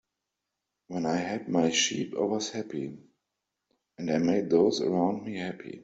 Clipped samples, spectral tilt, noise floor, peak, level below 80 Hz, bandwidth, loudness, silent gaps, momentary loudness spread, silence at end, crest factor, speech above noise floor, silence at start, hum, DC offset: under 0.1%; -4 dB/octave; -85 dBFS; -10 dBFS; -70 dBFS; 8 kHz; -28 LUFS; none; 13 LU; 0 s; 20 dB; 57 dB; 0.9 s; none; under 0.1%